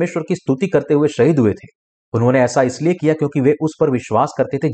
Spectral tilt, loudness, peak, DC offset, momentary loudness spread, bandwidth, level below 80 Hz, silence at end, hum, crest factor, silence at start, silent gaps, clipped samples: -7 dB/octave; -17 LUFS; -4 dBFS; under 0.1%; 6 LU; 9 kHz; -54 dBFS; 0 s; none; 14 dB; 0 s; 1.75-2.12 s; under 0.1%